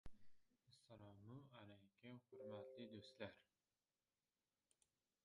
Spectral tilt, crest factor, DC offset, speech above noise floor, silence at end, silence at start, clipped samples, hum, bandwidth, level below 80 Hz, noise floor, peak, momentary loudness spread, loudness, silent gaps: -6 dB/octave; 24 dB; under 0.1%; over 32 dB; 1.8 s; 0.05 s; under 0.1%; none; 11 kHz; -78 dBFS; under -90 dBFS; -38 dBFS; 9 LU; -61 LUFS; none